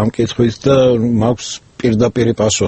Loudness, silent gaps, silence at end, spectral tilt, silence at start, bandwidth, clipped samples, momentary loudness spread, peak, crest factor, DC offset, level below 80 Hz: -14 LUFS; none; 0 s; -5.5 dB/octave; 0 s; 8.6 kHz; under 0.1%; 7 LU; 0 dBFS; 14 dB; under 0.1%; -40 dBFS